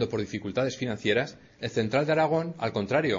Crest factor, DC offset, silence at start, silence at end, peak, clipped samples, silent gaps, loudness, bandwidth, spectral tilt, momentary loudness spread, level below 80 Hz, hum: 16 dB; under 0.1%; 0 s; 0 s; -12 dBFS; under 0.1%; none; -28 LUFS; 7.8 kHz; -6 dB/octave; 8 LU; -60 dBFS; none